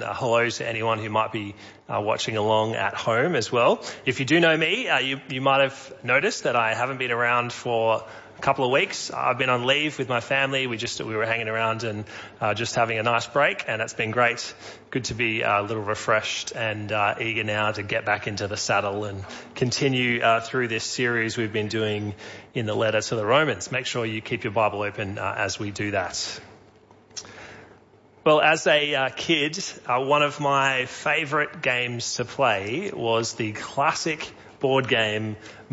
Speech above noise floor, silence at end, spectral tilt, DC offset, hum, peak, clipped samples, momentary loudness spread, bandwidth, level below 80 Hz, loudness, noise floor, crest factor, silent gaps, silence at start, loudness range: 30 dB; 0.05 s; -4 dB/octave; under 0.1%; none; -6 dBFS; under 0.1%; 10 LU; 8 kHz; -62 dBFS; -24 LUFS; -54 dBFS; 18 dB; none; 0 s; 3 LU